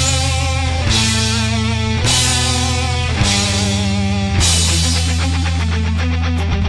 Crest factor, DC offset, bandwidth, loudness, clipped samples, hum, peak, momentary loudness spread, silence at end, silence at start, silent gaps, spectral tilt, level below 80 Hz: 14 dB; under 0.1%; 12 kHz; -15 LUFS; under 0.1%; none; -2 dBFS; 5 LU; 0 s; 0 s; none; -3.5 dB/octave; -26 dBFS